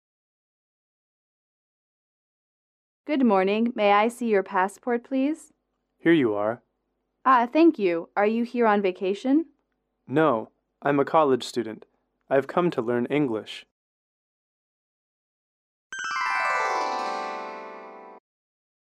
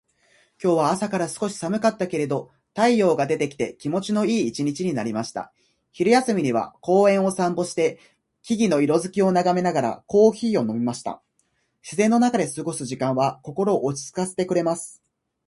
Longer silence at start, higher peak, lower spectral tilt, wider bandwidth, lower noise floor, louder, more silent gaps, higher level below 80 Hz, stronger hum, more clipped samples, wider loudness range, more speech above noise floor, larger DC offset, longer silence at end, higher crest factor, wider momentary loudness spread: first, 3.05 s vs 0.6 s; second, -8 dBFS vs -4 dBFS; about the same, -6 dB/octave vs -5.5 dB/octave; about the same, 12.5 kHz vs 11.5 kHz; first, -77 dBFS vs -69 dBFS; about the same, -24 LUFS vs -22 LUFS; first, 13.71-15.90 s vs none; second, -76 dBFS vs -64 dBFS; neither; neither; first, 7 LU vs 3 LU; first, 54 dB vs 48 dB; neither; about the same, 0.65 s vs 0.55 s; about the same, 18 dB vs 18 dB; first, 17 LU vs 10 LU